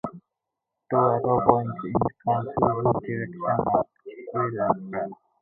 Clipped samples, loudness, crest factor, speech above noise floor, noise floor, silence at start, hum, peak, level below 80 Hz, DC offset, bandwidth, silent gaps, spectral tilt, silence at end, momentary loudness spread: under 0.1%; -25 LUFS; 24 dB; 60 dB; -84 dBFS; 0.05 s; none; -2 dBFS; -52 dBFS; under 0.1%; 3.8 kHz; none; -12 dB/octave; 0.25 s; 11 LU